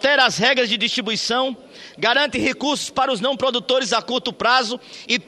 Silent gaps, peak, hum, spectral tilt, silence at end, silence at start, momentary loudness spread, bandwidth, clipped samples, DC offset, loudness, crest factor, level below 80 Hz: none; -2 dBFS; none; -2.5 dB/octave; 0.05 s; 0 s; 7 LU; 13 kHz; under 0.1%; under 0.1%; -19 LUFS; 18 dB; -58 dBFS